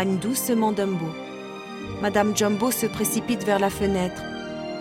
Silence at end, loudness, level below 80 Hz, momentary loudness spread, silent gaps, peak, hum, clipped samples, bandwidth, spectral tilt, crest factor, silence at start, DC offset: 0 s; -24 LUFS; -50 dBFS; 13 LU; none; -6 dBFS; none; under 0.1%; 16.5 kHz; -4.5 dB/octave; 18 dB; 0 s; under 0.1%